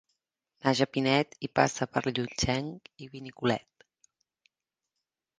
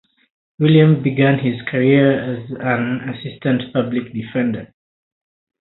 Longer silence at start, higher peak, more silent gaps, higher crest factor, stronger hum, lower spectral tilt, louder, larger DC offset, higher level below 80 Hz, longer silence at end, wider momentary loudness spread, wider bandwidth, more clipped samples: about the same, 0.65 s vs 0.6 s; second, -6 dBFS vs 0 dBFS; neither; first, 26 dB vs 18 dB; neither; second, -4.5 dB/octave vs -12.5 dB/octave; second, -29 LUFS vs -17 LUFS; neither; about the same, -56 dBFS vs -56 dBFS; first, 1.8 s vs 0.95 s; first, 17 LU vs 12 LU; first, 10 kHz vs 4.1 kHz; neither